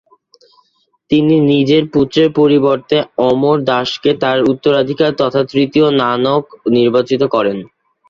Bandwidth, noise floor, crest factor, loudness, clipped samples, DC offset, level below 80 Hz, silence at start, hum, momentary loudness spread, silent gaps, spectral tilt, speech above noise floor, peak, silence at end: 7.2 kHz; -56 dBFS; 12 dB; -13 LUFS; under 0.1%; under 0.1%; -52 dBFS; 1.1 s; none; 5 LU; none; -7 dB/octave; 44 dB; 0 dBFS; 0.45 s